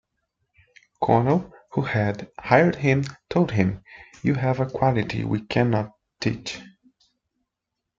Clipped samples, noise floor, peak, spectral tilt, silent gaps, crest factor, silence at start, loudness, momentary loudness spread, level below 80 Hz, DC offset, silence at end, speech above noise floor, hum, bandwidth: under 0.1%; -83 dBFS; -4 dBFS; -7.5 dB/octave; none; 22 dB; 1 s; -23 LUFS; 12 LU; -54 dBFS; under 0.1%; 1.3 s; 61 dB; none; 7.6 kHz